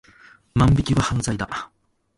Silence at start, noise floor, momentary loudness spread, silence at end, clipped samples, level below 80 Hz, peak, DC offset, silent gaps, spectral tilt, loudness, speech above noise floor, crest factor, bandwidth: 0.55 s; -51 dBFS; 13 LU; 0.55 s; under 0.1%; -36 dBFS; -4 dBFS; under 0.1%; none; -6 dB/octave; -21 LUFS; 31 dB; 20 dB; 11.5 kHz